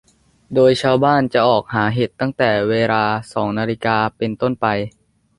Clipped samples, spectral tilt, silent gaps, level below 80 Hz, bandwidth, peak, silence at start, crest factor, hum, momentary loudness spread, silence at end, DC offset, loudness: under 0.1%; -6.5 dB/octave; none; -52 dBFS; 11.5 kHz; -2 dBFS; 0.5 s; 16 dB; none; 7 LU; 0.5 s; under 0.1%; -17 LUFS